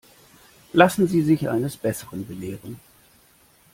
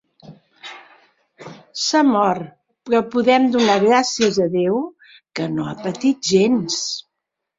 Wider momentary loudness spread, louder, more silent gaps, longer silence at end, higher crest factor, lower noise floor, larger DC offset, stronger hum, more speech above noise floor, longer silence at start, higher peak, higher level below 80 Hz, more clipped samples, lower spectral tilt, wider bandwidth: about the same, 19 LU vs 17 LU; second, -22 LUFS vs -18 LUFS; neither; first, 0.95 s vs 0.6 s; about the same, 22 dB vs 18 dB; second, -57 dBFS vs -80 dBFS; neither; neither; second, 35 dB vs 63 dB; first, 0.75 s vs 0.25 s; about the same, -2 dBFS vs -2 dBFS; about the same, -58 dBFS vs -62 dBFS; neither; first, -6 dB/octave vs -4 dB/octave; first, 16.5 kHz vs 7.8 kHz